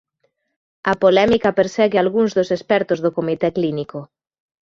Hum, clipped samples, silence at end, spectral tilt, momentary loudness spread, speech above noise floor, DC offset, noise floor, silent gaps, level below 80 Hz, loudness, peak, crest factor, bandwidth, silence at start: none; under 0.1%; 0.6 s; -6 dB/octave; 10 LU; 51 dB; under 0.1%; -69 dBFS; none; -52 dBFS; -18 LUFS; -2 dBFS; 16 dB; 7.6 kHz; 0.85 s